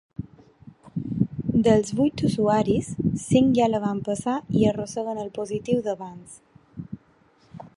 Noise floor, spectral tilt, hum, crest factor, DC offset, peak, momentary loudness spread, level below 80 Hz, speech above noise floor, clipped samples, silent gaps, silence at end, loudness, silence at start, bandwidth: -59 dBFS; -7 dB/octave; none; 20 dB; under 0.1%; -4 dBFS; 20 LU; -50 dBFS; 36 dB; under 0.1%; none; 0.1 s; -24 LUFS; 0.2 s; 11.5 kHz